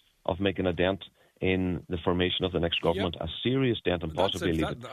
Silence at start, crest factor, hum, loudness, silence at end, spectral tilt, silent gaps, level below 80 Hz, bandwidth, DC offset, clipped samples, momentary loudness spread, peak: 0.25 s; 18 dB; none; -29 LUFS; 0 s; -6.5 dB/octave; none; -48 dBFS; 14 kHz; under 0.1%; under 0.1%; 5 LU; -10 dBFS